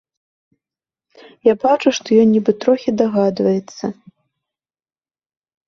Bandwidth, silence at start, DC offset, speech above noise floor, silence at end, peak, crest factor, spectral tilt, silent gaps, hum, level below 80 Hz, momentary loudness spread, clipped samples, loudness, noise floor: 7.2 kHz; 1.45 s; under 0.1%; over 74 dB; 1.75 s; -2 dBFS; 16 dB; -6 dB/octave; none; none; -62 dBFS; 10 LU; under 0.1%; -16 LUFS; under -90 dBFS